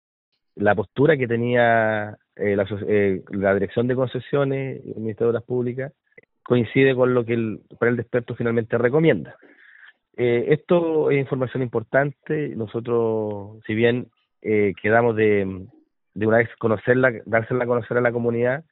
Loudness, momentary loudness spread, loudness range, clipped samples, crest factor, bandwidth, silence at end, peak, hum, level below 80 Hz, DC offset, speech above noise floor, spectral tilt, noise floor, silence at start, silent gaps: -22 LUFS; 10 LU; 3 LU; under 0.1%; 20 dB; 4.1 kHz; 0.1 s; -2 dBFS; none; -60 dBFS; under 0.1%; 30 dB; -6 dB/octave; -51 dBFS; 0.55 s; none